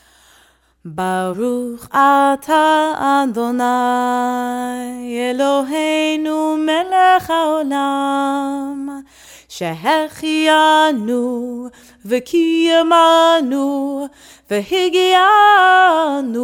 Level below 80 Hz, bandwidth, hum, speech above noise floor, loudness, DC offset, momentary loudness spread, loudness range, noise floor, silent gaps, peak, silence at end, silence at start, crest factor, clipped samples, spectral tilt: -58 dBFS; 17 kHz; none; 38 dB; -15 LUFS; under 0.1%; 14 LU; 5 LU; -53 dBFS; none; -2 dBFS; 0 s; 0.85 s; 14 dB; under 0.1%; -3.5 dB/octave